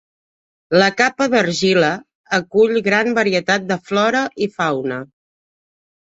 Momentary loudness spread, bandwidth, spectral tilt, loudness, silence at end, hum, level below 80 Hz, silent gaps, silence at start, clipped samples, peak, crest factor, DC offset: 7 LU; 8 kHz; -4.5 dB/octave; -17 LUFS; 1.1 s; none; -60 dBFS; 2.15-2.24 s; 0.7 s; under 0.1%; -2 dBFS; 16 dB; under 0.1%